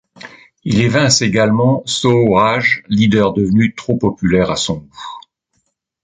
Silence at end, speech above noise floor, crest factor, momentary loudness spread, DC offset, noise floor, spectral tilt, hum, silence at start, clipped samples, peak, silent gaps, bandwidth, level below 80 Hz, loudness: 0.85 s; 53 dB; 14 dB; 10 LU; under 0.1%; -67 dBFS; -5 dB/octave; none; 0.25 s; under 0.1%; 0 dBFS; none; 9.6 kHz; -42 dBFS; -14 LUFS